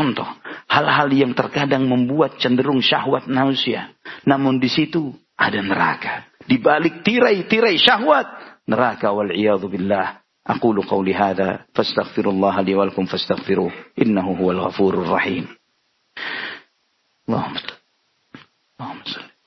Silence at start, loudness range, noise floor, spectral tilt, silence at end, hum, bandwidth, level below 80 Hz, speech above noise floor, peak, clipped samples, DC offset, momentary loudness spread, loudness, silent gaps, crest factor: 0 s; 7 LU; -67 dBFS; -6.5 dB/octave; 0.2 s; none; 6.2 kHz; -60 dBFS; 48 dB; 0 dBFS; under 0.1%; under 0.1%; 15 LU; -19 LUFS; none; 20 dB